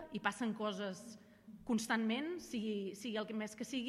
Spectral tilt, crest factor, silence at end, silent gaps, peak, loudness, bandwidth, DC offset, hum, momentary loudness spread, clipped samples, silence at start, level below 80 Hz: -4.5 dB/octave; 22 dB; 0 s; none; -20 dBFS; -40 LUFS; 14.5 kHz; under 0.1%; none; 16 LU; under 0.1%; 0 s; -74 dBFS